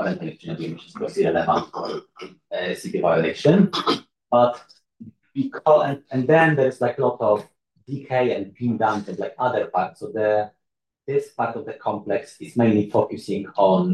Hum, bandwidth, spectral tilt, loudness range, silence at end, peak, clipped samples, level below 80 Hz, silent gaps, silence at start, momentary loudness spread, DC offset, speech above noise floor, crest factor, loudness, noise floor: none; 12.5 kHz; -7 dB/octave; 4 LU; 0 s; -4 dBFS; under 0.1%; -68 dBFS; none; 0 s; 14 LU; under 0.1%; 61 dB; 18 dB; -22 LUFS; -82 dBFS